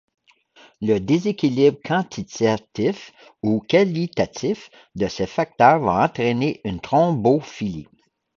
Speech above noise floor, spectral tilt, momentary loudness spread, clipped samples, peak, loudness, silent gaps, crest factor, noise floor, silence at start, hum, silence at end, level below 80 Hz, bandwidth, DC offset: 33 dB; -6.5 dB/octave; 12 LU; under 0.1%; 0 dBFS; -21 LUFS; none; 20 dB; -53 dBFS; 0.8 s; none; 0.55 s; -52 dBFS; 7.4 kHz; under 0.1%